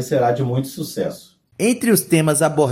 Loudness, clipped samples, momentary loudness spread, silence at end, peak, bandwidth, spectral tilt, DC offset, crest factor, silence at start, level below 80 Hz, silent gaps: -19 LUFS; under 0.1%; 11 LU; 0 s; -2 dBFS; 17 kHz; -5 dB/octave; under 0.1%; 16 dB; 0 s; -60 dBFS; none